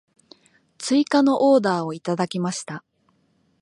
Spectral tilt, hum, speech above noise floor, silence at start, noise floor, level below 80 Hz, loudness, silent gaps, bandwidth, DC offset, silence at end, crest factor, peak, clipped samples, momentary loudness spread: -5.5 dB/octave; none; 45 dB; 0.8 s; -65 dBFS; -72 dBFS; -21 LUFS; none; 11.5 kHz; under 0.1%; 0.85 s; 16 dB; -6 dBFS; under 0.1%; 15 LU